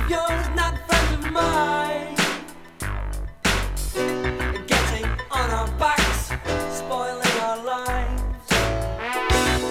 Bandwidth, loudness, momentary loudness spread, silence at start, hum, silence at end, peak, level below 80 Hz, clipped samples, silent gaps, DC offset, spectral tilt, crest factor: 16.5 kHz; -23 LUFS; 8 LU; 0 s; none; 0 s; -6 dBFS; -30 dBFS; under 0.1%; none; under 0.1%; -4 dB/octave; 18 dB